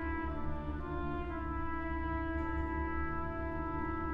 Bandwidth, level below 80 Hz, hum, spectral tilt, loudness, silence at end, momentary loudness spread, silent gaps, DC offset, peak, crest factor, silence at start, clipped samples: 5 kHz; -42 dBFS; none; -9.5 dB/octave; -38 LUFS; 0 s; 3 LU; none; under 0.1%; -24 dBFS; 12 dB; 0 s; under 0.1%